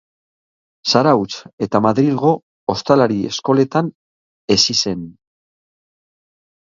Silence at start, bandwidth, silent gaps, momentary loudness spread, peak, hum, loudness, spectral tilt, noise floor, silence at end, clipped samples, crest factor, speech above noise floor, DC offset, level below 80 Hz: 0.85 s; 7.6 kHz; 1.53-1.58 s, 2.43-2.67 s, 3.95-4.48 s; 13 LU; 0 dBFS; none; -16 LUFS; -5 dB/octave; under -90 dBFS; 1.55 s; under 0.1%; 18 dB; over 74 dB; under 0.1%; -54 dBFS